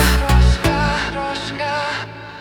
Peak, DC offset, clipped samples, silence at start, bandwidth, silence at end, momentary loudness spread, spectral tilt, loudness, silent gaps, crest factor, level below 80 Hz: -2 dBFS; under 0.1%; under 0.1%; 0 s; 19.5 kHz; 0 s; 9 LU; -5 dB/octave; -18 LUFS; none; 16 dB; -20 dBFS